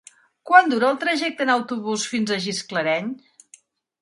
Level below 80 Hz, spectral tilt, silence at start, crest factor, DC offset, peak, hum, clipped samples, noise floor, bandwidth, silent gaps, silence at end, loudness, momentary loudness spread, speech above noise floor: -72 dBFS; -3.5 dB/octave; 0.45 s; 22 dB; under 0.1%; 0 dBFS; none; under 0.1%; -54 dBFS; 11.5 kHz; none; 0.85 s; -21 LUFS; 10 LU; 33 dB